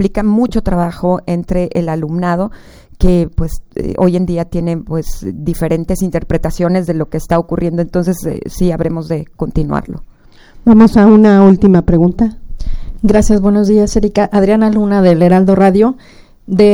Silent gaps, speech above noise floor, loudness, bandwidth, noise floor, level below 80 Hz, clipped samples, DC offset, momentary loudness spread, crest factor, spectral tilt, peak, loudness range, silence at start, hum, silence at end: none; 28 dB; -12 LUFS; over 20 kHz; -39 dBFS; -24 dBFS; 0.2%; under 0.1%; 14 LU; 12 dB; -8 dB/octave; 0 dBFS; 7 LU; 0 s; none; 0 s